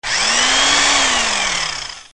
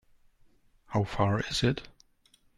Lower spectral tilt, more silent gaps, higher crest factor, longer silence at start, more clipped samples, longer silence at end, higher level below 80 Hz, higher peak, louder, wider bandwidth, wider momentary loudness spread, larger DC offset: second, 1 dB/octave vs -5.5 dB/octave; neither; about the same, 16 dB vs 20 dB; second, 0 s vs 0.9 s; neither; second, 0 s vs 0.7 s; first, -42 dBFS vs -52 dBFS; first, -2 dBFS vs -12 dBFS; first, -13 LUFS vs -30 LUFS; about the same, 11.5 kHz vs 12 kHz; first, 9 LU vs 6 LU; first, 1% vs under 0.1%